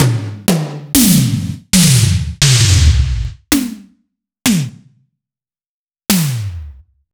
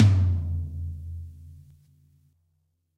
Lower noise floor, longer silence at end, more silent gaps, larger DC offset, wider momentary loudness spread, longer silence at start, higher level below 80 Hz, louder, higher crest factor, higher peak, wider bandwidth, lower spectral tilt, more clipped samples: first, under -90 dBFS vs -73 dBFS; second, 0.4 s vs 1.4 s; first, 5.66-5.87 s vs none; neither; second, 14 LU vs 24 LU; about the same, 0 s vs 0 s; first, -24 dBFS vs -42 dBFS; first, -13 LUFS vs -27 LUFS; second, 14 dB vs 20 dB; first, 0 dBFS vs -8 dBFS; first, over 20 kHz vs 6.8 kHz; second, -4 dB/octave vs -8 dB/octave; neither